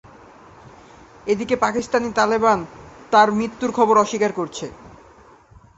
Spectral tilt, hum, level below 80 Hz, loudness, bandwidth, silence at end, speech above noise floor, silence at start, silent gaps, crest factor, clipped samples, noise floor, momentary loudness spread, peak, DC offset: -4.5 dB/octave; none; -54 dBFS; -19 LUFS; 8.2 kHz; 0.9 s; 30 dB; 0.65 s; none; 20 dB; under 0.1%; -49 dBFS; 14 LU; -2 dBFS; under 0.1%